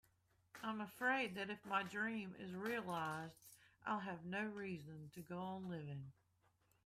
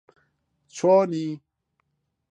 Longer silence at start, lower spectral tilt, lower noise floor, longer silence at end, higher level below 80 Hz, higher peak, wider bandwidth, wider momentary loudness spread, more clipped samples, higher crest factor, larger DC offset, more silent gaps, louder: second, 0.55 s vs 0.75 s; about the same, -5.5 dB/octave vs -6.5 dB/octave; first, -79 dBFS vs -75 dBFS; second, 0.75 s vs 0.95 s; about the same, -82 dBFS vs -78 dBFS; second, -26 dBFS vs -8 dBFS; first, 15.5 kHz vs 9.4 kHz; second, 15 LU vs 21 LU; neither; about the same, 20 dB vs 18 dB; neither; neither; second, -45 LUFS vs -22 LUFS